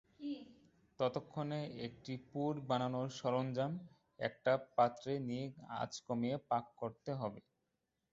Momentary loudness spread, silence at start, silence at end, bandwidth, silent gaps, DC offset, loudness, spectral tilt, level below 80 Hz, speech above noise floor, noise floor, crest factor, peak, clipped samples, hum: 11 LU; 0.2 s; 0.7 s; 7.6 kHz; none; under 0.1%; -40 LUFS; -5.5 dB/octave; -76 dBFS; 47 dB; -86 dBFS; 22 dB; -20 dBFS; under 0.1%; none